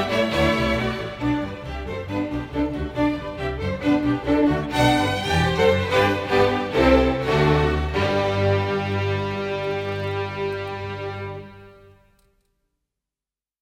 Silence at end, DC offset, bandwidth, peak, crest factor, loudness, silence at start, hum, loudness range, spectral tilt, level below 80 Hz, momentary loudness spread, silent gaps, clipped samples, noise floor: 1.9 s; under 0.1%; 16 kHz; -4 dBFS; 18 dB; -22 LUFS; 0 s; none; 10 LU; -6.5 dB/octave; -36 dBFS; 11 LU; none; under 0.1%; under -90 dBFS